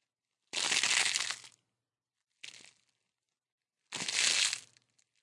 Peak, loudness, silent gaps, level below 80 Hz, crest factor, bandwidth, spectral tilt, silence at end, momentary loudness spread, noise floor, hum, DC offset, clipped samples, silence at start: -10 dBFS; -30 LUFS; 3.52-3.58 s; under -90 dBFS; 28 dB; 11.5 kHz; 2 dB/octave; 0.6 s; 23 LU; under -90 dBFS; none; under 0.1%; under 0.1%; 0.55 s